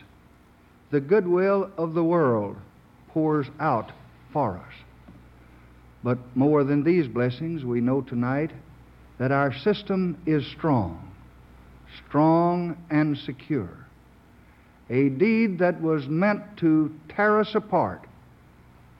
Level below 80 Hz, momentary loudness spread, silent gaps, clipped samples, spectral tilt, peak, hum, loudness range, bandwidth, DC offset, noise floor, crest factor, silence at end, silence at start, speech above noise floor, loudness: -56 dBFS; 9 LU; none; under 0.1%; -9.5 dB/octave; -8 dBFS; none; 4 LU; 5.8 kHz; under 0.1%; -55 dBFS; 16 dB; 0.95 s; 0.9 s; 31 dB; -24 LUFS